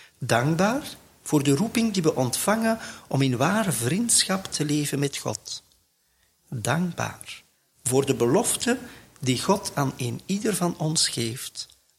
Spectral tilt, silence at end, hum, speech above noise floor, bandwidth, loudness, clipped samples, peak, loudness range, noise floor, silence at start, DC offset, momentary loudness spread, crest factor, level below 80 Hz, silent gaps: -4 dB/octave; 0.35 s; none; 42 dB; 16.5 kHz; -24 LUFS; under 0.1%; -6 dBFS; 6 LU; -67 dBFS; 0.2 s; under 0.1%; 12 LU; 18 dB; -60 dBFS; none